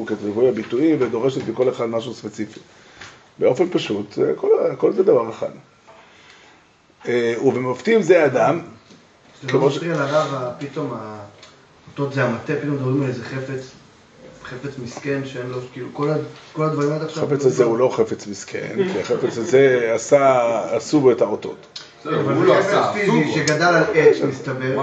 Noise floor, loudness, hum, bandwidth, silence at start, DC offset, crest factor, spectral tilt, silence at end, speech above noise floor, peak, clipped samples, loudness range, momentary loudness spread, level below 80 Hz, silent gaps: -53 dBFS; -19 LUFS; none; 8.2 kHz; 0 s; under 0.1%; 18 dB; -6 dB/octave; 0 s; 34 dB; -2 dBFS; under 0.1%; 8 LU; 16 LU; -64 dBFS; none